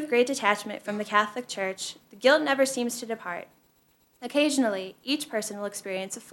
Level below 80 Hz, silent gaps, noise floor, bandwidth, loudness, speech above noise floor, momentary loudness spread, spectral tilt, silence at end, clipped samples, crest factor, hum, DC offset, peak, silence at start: -78 dBFS; none; -65 dBFS; 17 kHz; -27 LUFS; 38 dB; 12 LU; -2.5 dB/octave; 0 s; under 0.1%; 22 dB; none; under 0.1%; -6 dBFS; 0 s